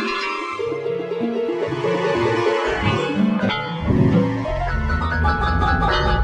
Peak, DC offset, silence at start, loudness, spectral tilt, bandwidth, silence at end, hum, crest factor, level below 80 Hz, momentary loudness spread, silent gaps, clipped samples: -4 dBFS; under 0.1%; 0 s; -20 LUFS; -7 dB/octave; 11 kHz; 0 s; none; 16 dB; -28 dBFS; 6 LU; none; under 0.1%